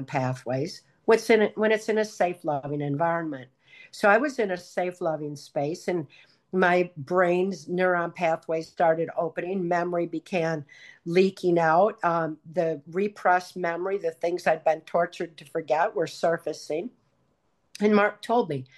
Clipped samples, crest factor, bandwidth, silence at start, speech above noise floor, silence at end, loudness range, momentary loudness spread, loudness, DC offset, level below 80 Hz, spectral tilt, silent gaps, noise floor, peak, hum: under 0.1%; 18 dB; 12.5 kHz; 0 s; 46 dB; 0.15 s; 3 LU; 10 LU; -26 LUFS; under 0.1%; -74 dBFS; -6 dB/octave; none; -71 dBFS; -8 dBFS; none